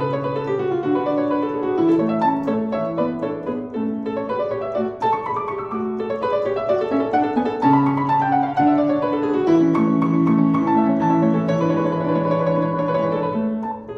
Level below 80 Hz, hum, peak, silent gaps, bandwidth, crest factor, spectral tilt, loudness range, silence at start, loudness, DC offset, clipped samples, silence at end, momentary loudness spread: -56 dBFS; none; -6 dBFS; none; 6.4 kHz; 14 dB; -9 dB/octave; 6 LU; 0 s; -20 LUFS; under 0.1%; under 0.1%; 0 s; 8 LU